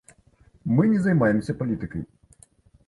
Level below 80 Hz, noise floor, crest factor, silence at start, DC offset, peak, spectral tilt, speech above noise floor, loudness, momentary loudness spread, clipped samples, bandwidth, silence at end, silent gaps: -52 dBFS; -58 dBFS; 18 dB; 0.65 s; under 0.1%; -6 dBFS; -9 dB/octave; 36 dB; -23 LUFS; 16 LU; under 0.1%; 11.5 kHz; 0.8 s; none